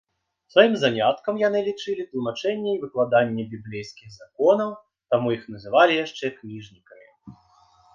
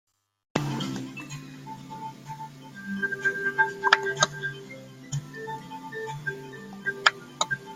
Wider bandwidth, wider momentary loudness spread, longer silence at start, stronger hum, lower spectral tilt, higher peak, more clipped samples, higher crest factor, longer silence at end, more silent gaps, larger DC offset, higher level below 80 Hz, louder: second, 7.4 kHz vs 16 kHz; about the same, 17 LU vs 18 LU; about the same, 0.55 s vs 0.55 s; neither; first, -5.5 dB/octave vs -3 dB/octave; about the same, -2 dBFS vs 0 dBFS; neither; second, 22 dB vs 30 dB; first, 0.65 s vs 0 s; neither; neither; about the same, -66 dBFS vs -64 dBFS; first, -23 LUFS vs -28 LUFS